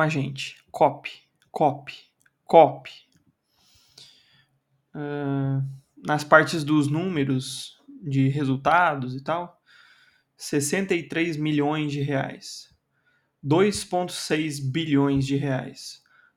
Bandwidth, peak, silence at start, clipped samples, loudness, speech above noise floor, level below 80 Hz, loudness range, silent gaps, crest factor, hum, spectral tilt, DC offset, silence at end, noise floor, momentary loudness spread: 15.5 kHz; 0 dBFS; 0 s; under 0.1%; -24 LUFS; 46 dB; -62 dBFS; 4 LU; none; 26 dB; none; -5.5 dB/octave; under 0.1%; 0.4 s; -70 dBFS; 20 LU